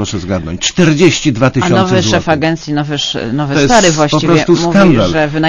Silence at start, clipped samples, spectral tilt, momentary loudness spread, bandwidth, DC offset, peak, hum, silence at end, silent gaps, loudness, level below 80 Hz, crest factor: 0 s; 0.8%; -5 dB/octave; 8 LU; 11 kHz; under 0.1%; 0 dBFS; none; 0 s; none; -11 LUFS; -32 dBFS; 10 dB